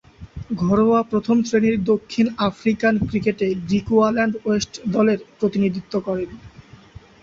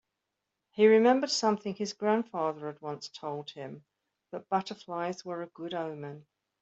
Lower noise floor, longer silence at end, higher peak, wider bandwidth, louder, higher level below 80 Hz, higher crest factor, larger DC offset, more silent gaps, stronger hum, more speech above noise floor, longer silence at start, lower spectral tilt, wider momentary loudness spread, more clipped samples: second, -44 dBFS vs -85 dBFS; first, 0.6 s vs 0.4 s; first, -4 dBFS vs -10 dBFS; about the same, 7.6 kHz vs 8.2 kHz; first, -20 LUFS vs -30 LUFS; first, -46 dBFS vs -80 dBFS; about the same, 16 dB vs 20 dB; neither; neither; neither; second, 25 dB vs 55 dB; second, 0.2 s vs 0.75 s; first, -6.5 dB/octave vs -4.5 dB/octave; second, 8 LU vs 20 LU; neither